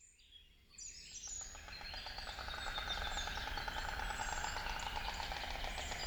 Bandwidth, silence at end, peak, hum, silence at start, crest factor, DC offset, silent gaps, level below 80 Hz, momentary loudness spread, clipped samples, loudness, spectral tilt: over 20 kHz; 0 s; -26 dBFS; none; 0 s; 18 dB; under 0.1%; none; -50 dBFS; 10 LU; under 0.1%; -43 LUFS; -1.5 dB/octave